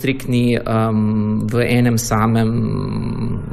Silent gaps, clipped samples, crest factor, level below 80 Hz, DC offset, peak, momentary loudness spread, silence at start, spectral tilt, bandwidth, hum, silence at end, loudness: none; under 0.1%; 12 dB; -36 dBFS; under 0.1%; -4 dBFS; 7 LU; 0 s; -6.5 dB/octave; 14.5 kHz; none; 0 s; -17 LUFS